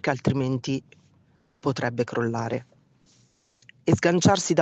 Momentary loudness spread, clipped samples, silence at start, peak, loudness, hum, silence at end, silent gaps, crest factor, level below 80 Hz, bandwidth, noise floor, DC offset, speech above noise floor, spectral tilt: 11 LU; under 0.1%; 0.05 s; -4 dBFS; -25 LUFS; none; 0 s; none; 22 dB; -60 dBFS; 8.6 kHz; -63 dBFS; under 0.1%; 39 dB; -5.5 dB/octave